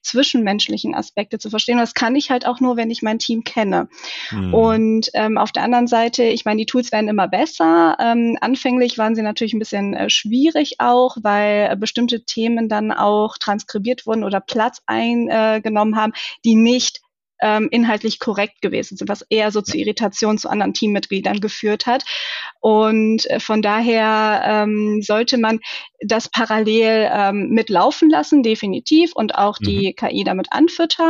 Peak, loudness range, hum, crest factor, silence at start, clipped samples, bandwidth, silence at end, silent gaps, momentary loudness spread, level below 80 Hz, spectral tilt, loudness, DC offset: -4 dBFS; 3 LU; none; 12 dB; 0.05 s; under 0.1%; 7.6 kHz; 0 s; none; 7 LU; -54 dBFS; -4.5 dB/octave; -17 LUFS; under 0.1%